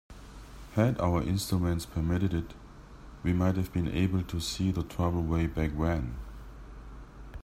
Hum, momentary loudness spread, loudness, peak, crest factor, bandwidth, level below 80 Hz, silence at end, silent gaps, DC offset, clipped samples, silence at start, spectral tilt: none; 21 LU; -30 LUFS; -12 dBFS; 20 dB; 16 kHz; -44 dBFS; 0 s; none; under 0.1%; under 0.1%; 0.1 s; -6.5 dB/octave